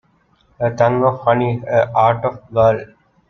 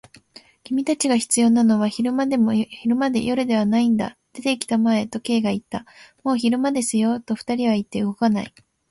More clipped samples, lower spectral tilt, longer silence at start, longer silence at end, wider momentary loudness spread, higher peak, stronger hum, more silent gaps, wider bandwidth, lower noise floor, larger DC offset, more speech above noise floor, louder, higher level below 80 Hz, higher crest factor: neither; first, -8 dB/octave vs -4.5 dB/octave; about the same, 0.6 s vs 0.7 s; about the same, 0.45 s vs 0.4 s; about the same, 7 LU vs 9 LU; about the same, -2 dBFS vs -4 dBFS; neither; neither; second, 6.6 kHz vs 11.5 kHz; first, -57 dBFS vs -49 dBFS; neither; first, 42 dB vs 29 dB; first, -16 LUFS vs -21 LUFS; first, -50 dBFS vs -60 dBFS; about the same, 16 dB vs 16 dB